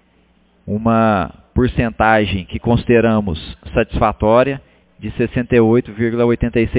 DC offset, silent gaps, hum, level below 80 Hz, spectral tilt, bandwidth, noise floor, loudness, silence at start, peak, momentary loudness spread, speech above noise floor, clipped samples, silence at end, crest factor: under 0.1%; none; none; -32 dBFS; -11 dB/octave; 4 kHz; -55 dBFS; -16 LUFS; 0.65 s; 0 dBFS; 9 LU; 40 dB; under 0.1%; 0 s; 16 dB